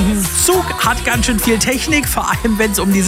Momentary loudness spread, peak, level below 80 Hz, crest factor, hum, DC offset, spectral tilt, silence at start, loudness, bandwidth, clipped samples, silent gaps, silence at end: 3 LU; -2 dBFS; -26 dBFS; 12 dB; none; under 0.1%; -3.5 dB/octave; 0 s; -14 LUFS; 16.5 kHz; under 0.1%; none; 0 s